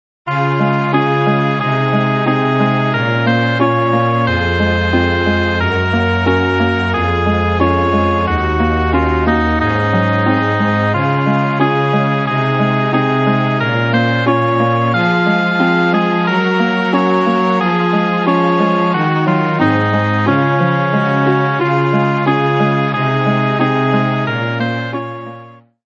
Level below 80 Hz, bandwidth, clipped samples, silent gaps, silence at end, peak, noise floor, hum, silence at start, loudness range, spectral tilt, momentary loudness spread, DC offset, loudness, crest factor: -32 dBFS; 7.4 kHz; under 0.1%; none; 0.3 s; 0 dBFS; -38 dBFS; none; 0.25 s; 1 LU; -8 dB/octave; 2 LU; under 0.1%; -14 LUFS; 14 dB